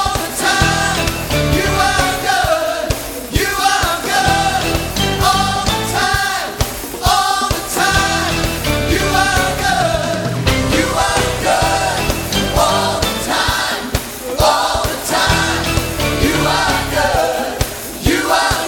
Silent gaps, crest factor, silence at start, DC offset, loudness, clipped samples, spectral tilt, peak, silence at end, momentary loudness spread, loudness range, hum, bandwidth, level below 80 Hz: none; 16 dB; 0 s; under 0.1%; -15 LUFS; under 0.1%; -3.5 dB/octave; 0 dBFS; 0 s; 5 LU; 1 LU; none; 18 kHz; -28 dBFS